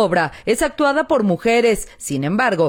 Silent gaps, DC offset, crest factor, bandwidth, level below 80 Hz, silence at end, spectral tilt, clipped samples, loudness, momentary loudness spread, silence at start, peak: none; under 0.1%; 12 dB; 18 kHz; -44 dBFS; 0 s; -5 dB/octave; under 0.1%; -18 LUFS; 7 LU; 0 s; -6 dBFS